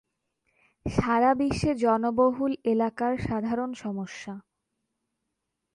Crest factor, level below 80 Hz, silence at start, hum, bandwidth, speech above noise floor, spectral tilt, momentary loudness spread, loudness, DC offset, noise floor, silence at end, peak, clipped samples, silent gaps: 18 dB; -50 dBFS; 0.85 s; none; 11 kHz; 56 dB; -7 dB/octave; 14 LU; -26 LUFS; under 0.1%; -82 dBFS; 1.35 s; -10 dBFS; under 0.1%; none